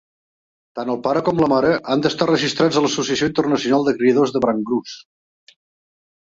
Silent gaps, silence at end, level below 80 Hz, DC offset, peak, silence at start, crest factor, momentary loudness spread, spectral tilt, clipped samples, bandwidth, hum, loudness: none; 1.3 s; -56 dBFS; under 0.1%; -4 dBFS; 0.75 s; 16 dB; 9 LU; -5 dB/octave; under 0.1%; 7.8 kHz; none; -18 LUFS